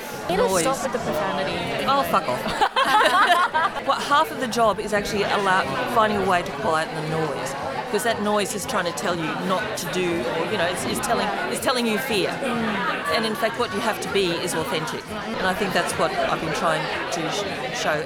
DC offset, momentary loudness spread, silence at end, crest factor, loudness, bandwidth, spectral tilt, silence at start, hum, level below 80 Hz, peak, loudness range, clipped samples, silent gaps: under 0.1%; 6 LU; 0 s; 18 dB; -22 LUFS; over 20 kHz; -3.5 dB/octave; 0 s; none; -50 dBFS; -6 dBFS; 4 LU; under 0.1%; none